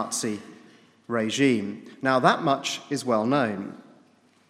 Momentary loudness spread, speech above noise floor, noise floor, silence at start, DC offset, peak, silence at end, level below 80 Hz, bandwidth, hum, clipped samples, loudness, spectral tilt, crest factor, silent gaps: 14 LU; 35 dB; -60 dBFS; 0 s; under 0.1%; -4 dBFS; 0.7 s; -76 dBFS; 15.5 kHz; none; under 0.1%; -25 LUFS; -4.5 dB/octave; 22 dB; none